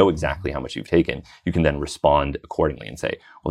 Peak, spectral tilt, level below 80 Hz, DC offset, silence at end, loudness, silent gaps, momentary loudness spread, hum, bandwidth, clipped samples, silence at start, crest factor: -4 dBFS; -6.5 dB/octave; -36 dBFS; under 0.1%; 0 s; -23 LUFS; none; 10 LU; none; 12.5 kHz; under 0.1%; 0 s; 18 dB